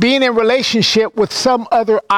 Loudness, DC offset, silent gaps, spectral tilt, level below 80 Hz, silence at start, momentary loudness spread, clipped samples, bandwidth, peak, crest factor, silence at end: -13 LUFS; under 0.1%; none; -3.5 dB/octave; -52 dBFS; 0 s; 3 LU; under 0.1%; 15.5 kHz; -4 dBFS; 10 dB; 0 s